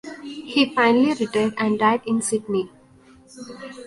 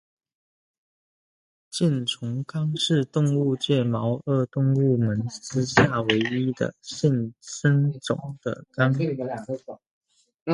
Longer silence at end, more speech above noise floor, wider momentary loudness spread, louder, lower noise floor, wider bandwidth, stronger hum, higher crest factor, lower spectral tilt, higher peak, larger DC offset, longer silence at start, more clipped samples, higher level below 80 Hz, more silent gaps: about the same, 0 s vs 0 s; second, 30 dB vs over 66 dB; first, 20 LU vs 11 LU; first, -20 LUFS vs -24 LUFS; second, -51 dBFS vs under -90 dBFS; about the same, 11.5 kHz vs 11.5 kHz; neither; second, 18 dB vs 24 dB; second, -4 dB/octave vs -6 dB/octave; about the same, -4 dBFS vs -2 dBFS; neither; second, 0.05 s vs 1.75 s; neither; second, -62 dBFS vs -56 dBFS; second, none vs 9.91-10.01 s, 10.34-10.46 s